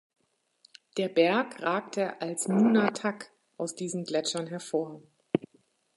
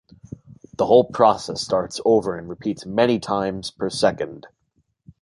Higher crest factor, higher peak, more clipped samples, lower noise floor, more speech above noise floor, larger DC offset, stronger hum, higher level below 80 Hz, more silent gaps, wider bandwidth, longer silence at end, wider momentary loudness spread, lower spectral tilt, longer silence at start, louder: about the same, 22 dB vs 20 dB; second, -8 dBFS vs -2 dBFS; neither; about the same, -68 dBFS vs -68 dBFS; second, 39 dB vs 48 dB; neither; neither; second, -78 dBFS vs -54 dBFS; neither; about the same, 11.5 kHz vs 11.5 kHz; second, 0.5 s vs 0.75 s; second, 13 LU vs 22 LU; about the same, -4.5 dB/octave vs -5 dB/octave; first, 0.95 s vs 0.8 s; second, -29 LUFS vs -21 LUFS